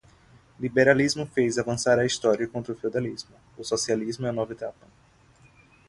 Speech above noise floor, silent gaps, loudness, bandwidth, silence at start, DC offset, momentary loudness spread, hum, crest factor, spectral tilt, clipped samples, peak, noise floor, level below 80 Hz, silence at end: 32 dB; none; -25 LUFS; 11.5 kHz; 0.6 s; under 0.1%; 16 LU; none; 22 dB; -4.5 dB/octave; under 0.1%; -4 dBFS; -57 dBFS; -60 dBFS; 1.2 s